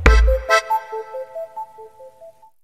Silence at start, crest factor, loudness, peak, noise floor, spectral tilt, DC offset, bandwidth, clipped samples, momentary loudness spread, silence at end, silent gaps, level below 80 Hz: 0 s; 20 dB; -20 LUFS; 0 dBFS; -46 dBFS; -5 dB/octave; 0.2%; 13.5 kHz; under 0.1%; 19 LU; 0.35 s; none; -22 dBFS